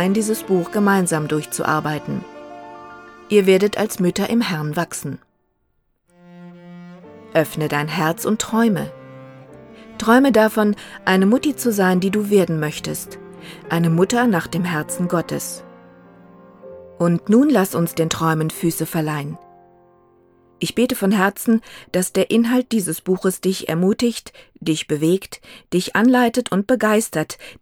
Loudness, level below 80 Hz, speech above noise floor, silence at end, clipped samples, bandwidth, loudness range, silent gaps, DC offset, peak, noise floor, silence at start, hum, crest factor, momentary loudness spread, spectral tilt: -19 LUFS; -56 dBFS; 48 dB; 0.1 s; under 0.1%; 19.5 kHz; 5 LU; none; under 0.1%; -2 dBFS; -66 dBFS; 0 s; none; 18 dB; 19 LU; -5.5 dB/octave